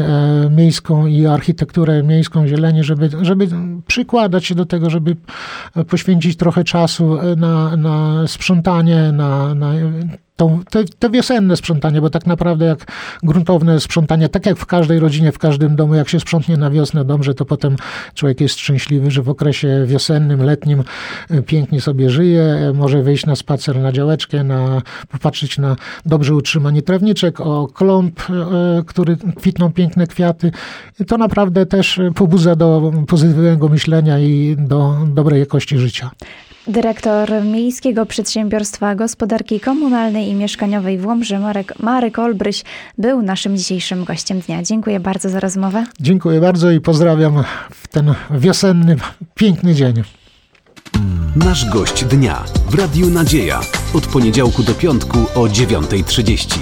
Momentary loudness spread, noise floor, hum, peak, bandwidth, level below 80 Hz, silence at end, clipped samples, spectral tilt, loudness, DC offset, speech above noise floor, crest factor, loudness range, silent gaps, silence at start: 7 LU; -50 dBFS; none; -2 dBFS; 16 kHz; -32 dBFS; 0 s; under 0.1%; -6.5 dB/octave; -14 LUFS; under 0.1%; 36 dB; 12 dB; 4 LU; none; 0 s